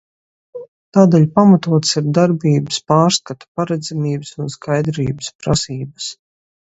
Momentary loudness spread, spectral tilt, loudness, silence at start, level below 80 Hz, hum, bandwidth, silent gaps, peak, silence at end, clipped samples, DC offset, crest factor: 16 LU; -6 dB/octave; -16 LUFS; 0.55 s; -48 dBFS; none; 8.2 kHz; 0.68-0.92 s, 3.48-3.55 s, 5.35-5.39 s; 0 dBFS; 0.55 s; under 0.1%; under 0.1%; 16 dB